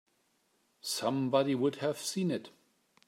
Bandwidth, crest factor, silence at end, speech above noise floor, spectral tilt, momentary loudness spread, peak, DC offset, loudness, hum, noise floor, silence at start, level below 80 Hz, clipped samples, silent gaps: 16 kHz; 18 dB; 0.6 s; 42 dB; -5 dB/octave; 8 LU; -16 dBFS; under 0.1%; -32 LUFS; none; -74 dBFS; 0.85 s; -82 dBFS; under 0.1%; none